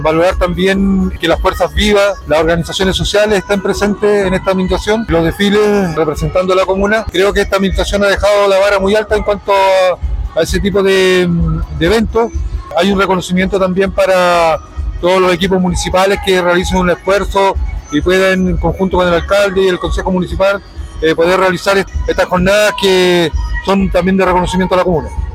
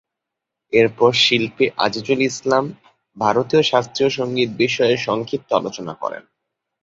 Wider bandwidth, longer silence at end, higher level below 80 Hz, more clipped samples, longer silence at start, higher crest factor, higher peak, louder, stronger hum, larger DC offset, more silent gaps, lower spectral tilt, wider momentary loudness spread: first, 16 kHz vs 7.8 kHz; second, 0 s vs 0.6 s; first, -24 dBFS vs -60 dBFS; neither; second, 0 s vs 0.7 s; second, 12 dB vs 18 dB; about the same, 0 dBFS vs -2 dBFS; first, -12 LUFS vs -18 LUFS; neither; neither; neither; about the same, -5.5 dB/octave vs -4.5 dB/octave; second, 5 LU vs 12 LU